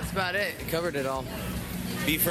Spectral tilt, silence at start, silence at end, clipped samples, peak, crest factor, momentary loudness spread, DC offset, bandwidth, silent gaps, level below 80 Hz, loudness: -4 dB/octave; 0 s; 0 s; under 0.1%; -12 dBFS; 18 dB; 7 LU; under 0.1%; 18.5 kHz; none; -44 dBFS; -30 LUFS